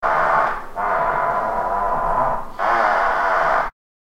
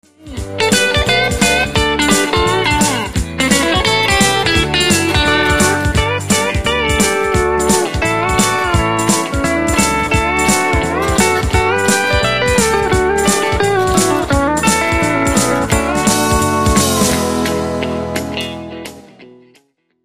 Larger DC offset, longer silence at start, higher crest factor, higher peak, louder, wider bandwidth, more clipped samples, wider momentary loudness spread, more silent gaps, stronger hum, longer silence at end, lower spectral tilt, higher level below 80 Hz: second, under 0.1% vs 0.9%; second, 0 s vs 0.2 s; about the same, 14 dB vs 14 dB; second, -6 dBFS vs 0 dBFS; second, -19 LUFS vs -13 LUFS; about the same, 16 kHz vs 15 kHz; neither; about the same, 6 LU vs 6 LU; neither; neither; second, 0.35 s vs 0.65 s; first, -5 dB/octave vs -3.5 dB/octave; second, -36 dBFS vs -26 dBFS